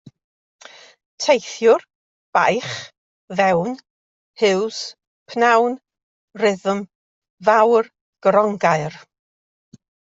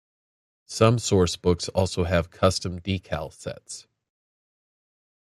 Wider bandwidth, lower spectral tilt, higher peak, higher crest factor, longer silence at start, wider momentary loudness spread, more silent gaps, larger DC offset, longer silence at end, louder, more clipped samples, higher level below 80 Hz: second, 7.8 kHz vs 13.5 kHz; about the same, -4.5 dB/octave vs -5 dB/octave; about the same, -2 dBFS vs -2 dBFS; second, 18 dB vs 24 dB; first, 1.2 s vs 0.7 s; about the same, 16 LU vs 16 LU; first, 1.95-2.33 s, 2.98-3.28 s, 3.90-4.34 s, 5.07-5.26 s, 6.03-6.28 s, 6.95-7.22 s, 7.30-7.38 s, 8.01-8.13 s vs none; neither; second, 1.1 s vs 1.4 s; first, -19 LUFS vs -24 LUFS; neither; second, -66 dBFS vs -50 dBFS